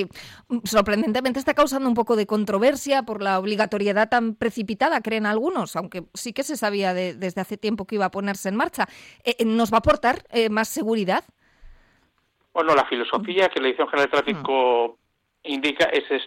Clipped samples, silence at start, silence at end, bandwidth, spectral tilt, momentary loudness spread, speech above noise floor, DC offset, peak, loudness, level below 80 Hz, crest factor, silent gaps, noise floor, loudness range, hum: under 0.1%; 0 s; 0 s; 16.5 kHz; -4.5 dB/octave; 9 LU; 45 dB; under 0.1%; -8 dBFS; -23 LUFS; -52 dBFS; 16 dB; none; -68 dBFS; 4 LU; none